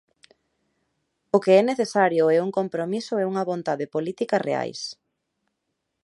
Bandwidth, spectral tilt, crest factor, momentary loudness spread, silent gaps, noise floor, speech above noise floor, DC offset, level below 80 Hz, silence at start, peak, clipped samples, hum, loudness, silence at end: 11.5 kHz; -5.5 dB/octave; 20 dB; 10 LU; none; -79 dBFS; 56 dB; under 0.1%; -76 dBFS; 1.35 s; -4 dBFS; under 0.1%; none; -23 LUFS; 1.1 s